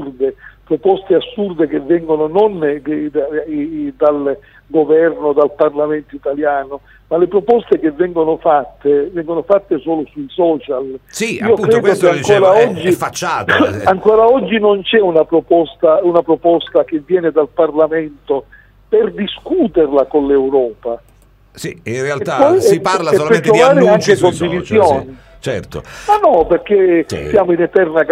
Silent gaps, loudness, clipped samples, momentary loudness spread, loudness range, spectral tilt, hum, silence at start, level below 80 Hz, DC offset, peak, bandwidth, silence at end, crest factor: none; -13 LUFS; under 0.1%; 11 LU; 4 LU; -5.5 dB/octave; none; 0 s; -46 dBFS; under 0.1%; 0 dBFS; 15.5 kHz; 0 s; 14 dB